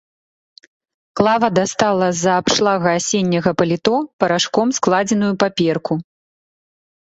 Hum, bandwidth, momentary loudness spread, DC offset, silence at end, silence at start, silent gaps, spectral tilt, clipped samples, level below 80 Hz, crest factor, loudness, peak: none; 8.2 kHz; 4 LU; under 0.1%; 1.1 s; 1.15 s; 4.13-4.19 s; -4.5 dB/octave; under 0.1%; -54 dBFS; 16 dB; -17 LUFS; -2 dBFS